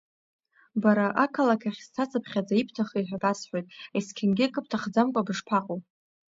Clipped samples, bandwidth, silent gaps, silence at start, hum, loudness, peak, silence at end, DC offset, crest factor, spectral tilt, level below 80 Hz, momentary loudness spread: under 0.1%; 7.8 kHz; none; 0.75 s; none; -27 LUFS; -8 dBFS; 0.5 s; under 0.1%; 20 dB; -6 dB/octave; -72 dBFS; 10 LU